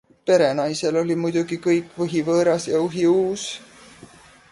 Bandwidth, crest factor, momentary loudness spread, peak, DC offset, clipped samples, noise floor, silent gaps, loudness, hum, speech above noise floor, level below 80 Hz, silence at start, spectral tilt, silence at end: 11.5 kHz; 16 dB; 7 LU; -6 dBFS; under 0.1%; under 0.1%; -47 dBFS; none; -21 LUFS; none; 27 dB; -62 dBFS; 0.25 s; -5.5 dB/octave; 0.45 s